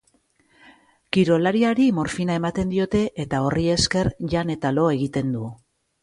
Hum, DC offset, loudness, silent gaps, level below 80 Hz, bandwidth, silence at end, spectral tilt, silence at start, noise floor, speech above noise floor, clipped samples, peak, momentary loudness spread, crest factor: none; under 0.1%; -22 LUFS; none; -46 dBFS; 11.5 kHz; 0.5 s; -5.5 dB/octave; 1.15 s; -63 dBFS; 42 dB; under 0.1%; -4 dBFS; 6 LU; 20 dB